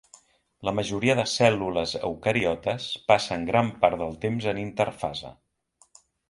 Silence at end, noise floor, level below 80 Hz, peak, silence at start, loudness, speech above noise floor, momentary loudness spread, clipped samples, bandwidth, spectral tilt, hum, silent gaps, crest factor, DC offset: 0.95 s; -64 dBFS; -54 dBFS; -4 dBFS; 0.6 s; -25 LUFS; 39 dB; 8 LU; under 0.1%; 11.5 kHz; -5 dB/octave; none; none; 24 dB; under 0.1%